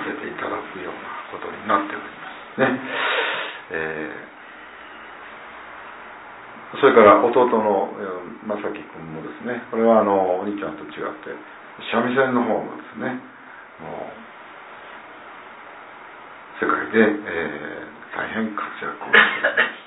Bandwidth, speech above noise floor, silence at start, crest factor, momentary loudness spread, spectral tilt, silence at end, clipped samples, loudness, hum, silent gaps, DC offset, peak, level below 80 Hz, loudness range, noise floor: 4.1 kHz; 21 dB; 0 s; 22 dB; 23 LU; -8.5 dB/octave; 0 s; under 0.1%; -21 LUFS; none; none; under 0.1%; 0 dBFS; -64 dBFS; 14 LU; -41 dBFS